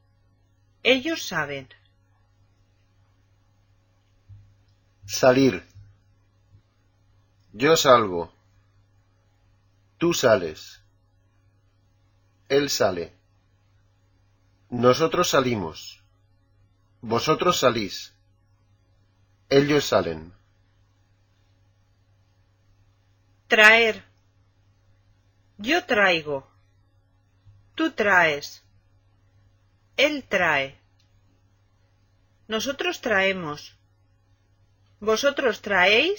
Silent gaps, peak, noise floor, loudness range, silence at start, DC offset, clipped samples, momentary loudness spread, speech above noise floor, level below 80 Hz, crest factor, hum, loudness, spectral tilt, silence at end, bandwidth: none; 0 dBFS; -63 dBFS; 7 LU; 0.85 s; under 0.1%; under 0.1%; 18 LU; 41 dB; -58 dBFS; 26 dB; none; -21 LUFS; -3.5 dB/octave; 0 s; 17 kHz